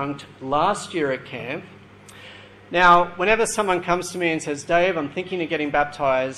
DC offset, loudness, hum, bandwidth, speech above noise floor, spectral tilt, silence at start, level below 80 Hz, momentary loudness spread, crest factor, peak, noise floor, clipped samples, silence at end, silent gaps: under 0.1%; -21 LUFS; none; 13 kHz; 23 dB; -4 dB/octave; 0 s; -48 dBFS; 15 LU; 18 dB; -4 dBFS; -45 dBFS; under 0.1%; 0 s; none